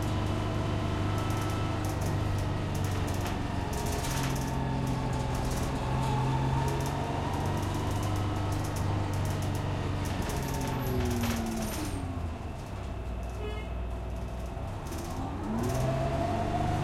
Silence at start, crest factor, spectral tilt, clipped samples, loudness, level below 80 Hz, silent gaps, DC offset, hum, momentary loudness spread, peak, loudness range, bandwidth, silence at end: 0 s; 14 dB; -6 dB/octave; under 0.1%; -32 LUFS; -40 dBFS; none; under 0.1%; none; 7 LU; -16 dBFS; 5 LU; 16.5 kHz; 0 s